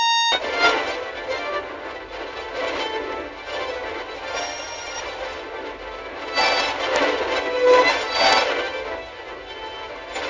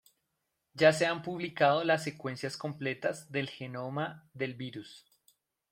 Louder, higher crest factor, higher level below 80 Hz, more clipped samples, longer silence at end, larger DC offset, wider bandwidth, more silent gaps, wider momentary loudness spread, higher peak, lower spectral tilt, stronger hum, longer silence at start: first, -22 LUFS vs -32 LUFS; about the same, 20 dB vs 24 dB; first, -52 dBFS vs -76 dBFS; neither; second, 0 s vs 0.7 s; neither; second, 7.6 kHz vs 16 kHz; neither; about the same, 16 LU vs 15 LU; first, -2 dBFS vs -10 dBFS; second, -1.5 dB/octave vs -5 dB/octave; neither; second, 0 s vs 0.75 s